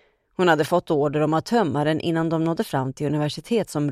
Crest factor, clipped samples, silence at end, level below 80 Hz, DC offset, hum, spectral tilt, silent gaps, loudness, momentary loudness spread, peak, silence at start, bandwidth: 18 dB; under 0.1%; 0 s; -58 dBFS; under 0.1%; none; -6.5 dB/octave; none; -22 LUFS; 5 LU; -4 dBFS; 0.4 s; 15.5 kHz